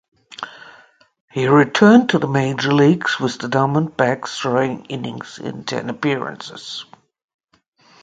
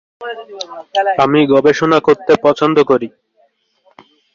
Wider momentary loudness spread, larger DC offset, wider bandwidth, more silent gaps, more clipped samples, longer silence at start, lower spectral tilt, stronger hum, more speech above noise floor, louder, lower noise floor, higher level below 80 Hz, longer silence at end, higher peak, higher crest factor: about the same, 18 LU vs 17 LU; neither; first, 9.2 kHz vs 7.4 kHz; first, 1.20-1.28 s vs none; neither; first, 0.4 s vs 0.2 s; about the same, -6 dB/octave vs -6 dB/octave; neither; second, 32 dB vs 45 dB; second, -17 LUFS vs -12 LUFS; second, -50 dBFS vs -58 dBFS; about the same, -60 dBFS vs -56 dBFS; about the same, 1.2 s vs 1.25 s; about the same, 0 dBFS vs -2 dBFS; about the same, 18 dB vs 14 dB